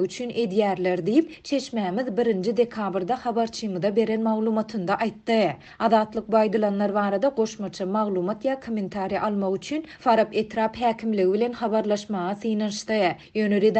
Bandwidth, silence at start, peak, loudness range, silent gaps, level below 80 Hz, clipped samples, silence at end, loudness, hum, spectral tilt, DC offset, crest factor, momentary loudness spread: 8.6 kHz; 0 s; -6 dBFS; 2 LU; none; -62 dBFS; under 0.1%; 0 s; -25 LUFS; none; -6 dB/octave; under 0.1%; 16 dB; 6 LU